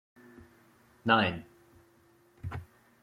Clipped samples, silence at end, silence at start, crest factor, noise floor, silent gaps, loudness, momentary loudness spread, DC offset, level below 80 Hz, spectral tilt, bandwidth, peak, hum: under 0.1%; 0.4 s; 1.05 s; 26 dB; -64 dBFS; none; -30 LUFS; 19 LU; under 0.1%; -62 dBFS; -6.5 dB/octave; 15.5 kHz; -8 dBFS; none